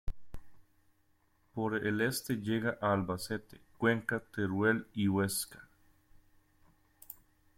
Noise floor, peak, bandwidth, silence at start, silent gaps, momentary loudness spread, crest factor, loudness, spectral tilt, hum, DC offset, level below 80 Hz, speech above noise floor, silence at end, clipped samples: -72 dBFS; -16 dBFS; 16.5 kHz; 0.05 s; none; 19 LU; 20 dB; -34 LUFS; -5 dB/octave; none; under 0.1%; -54 dBFS; 39 dB; 0.45 s; under 0.1%